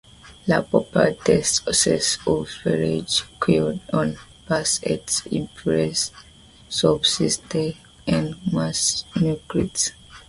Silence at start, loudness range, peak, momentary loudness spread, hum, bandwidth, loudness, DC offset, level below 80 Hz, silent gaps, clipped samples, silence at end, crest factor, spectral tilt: 0.25 s; 3 LU; -2 dBFS; 8 LU; none; 11.5 kHz; -22 LUFS; under 0.1%; -48 dBFS; none; under 0.1%; 0.1 s; 22 dB; -3.5 dB/octave